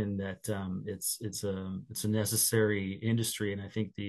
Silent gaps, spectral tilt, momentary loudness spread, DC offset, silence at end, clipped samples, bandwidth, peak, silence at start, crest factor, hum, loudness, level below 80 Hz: none; -4.5 dB/octave; 10 LU; under 0.1%; 0 s; under 0.1%; 13 kHz; -14 dBFS; 0 s; 18 dB; none; -32 LUFS; -68 dBFS